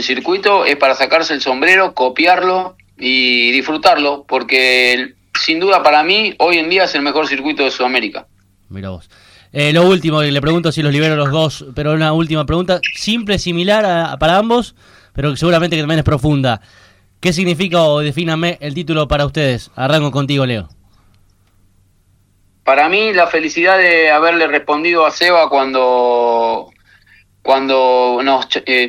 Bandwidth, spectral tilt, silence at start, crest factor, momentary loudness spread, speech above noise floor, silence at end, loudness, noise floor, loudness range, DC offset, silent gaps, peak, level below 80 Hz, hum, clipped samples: 16 kHz; -5 dB/octave; 0 s; 14 dB; 9 LU; 41 dB; 0 s; -13 LUFS; -54 dBFS; 5 LU; under 0.1%; none; 0 dBFS; -40 dBFS; none; under 0.1%